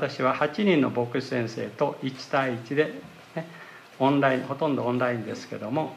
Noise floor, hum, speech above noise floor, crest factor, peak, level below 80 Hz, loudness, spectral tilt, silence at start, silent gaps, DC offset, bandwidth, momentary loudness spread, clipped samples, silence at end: -46 dBFS; none; 20 dB; 18 dB; -8 dBFS; -74 dBFS; -26 LUFS; -6.5 dB/octave; 0 s; none; under 0.1%; 14 kHz; 15 LU; under 0.1%; 0 s